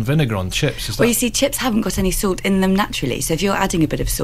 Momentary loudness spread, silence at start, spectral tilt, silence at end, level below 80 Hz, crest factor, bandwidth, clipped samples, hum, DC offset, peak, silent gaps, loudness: 4 LU; 0 s; -4.5 dB/octave; 0 s; -32 dBFS; 16 dB; 16 kHz; under 0.1%; none; 1%; -2 dBFS; none; -18 LUFS